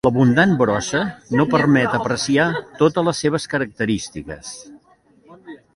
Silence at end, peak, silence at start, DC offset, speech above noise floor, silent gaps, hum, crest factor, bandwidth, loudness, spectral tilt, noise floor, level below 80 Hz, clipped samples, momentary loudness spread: 0.2 s; -2 dBFS; 0.05 s; under 0.1%; 36 dB; none; none; 16 dB; 11.5 kHz; -18 LUFS; -5.5 dB/octave; -54 dBFS; -50 dBFS; under 0.1%; 16 LU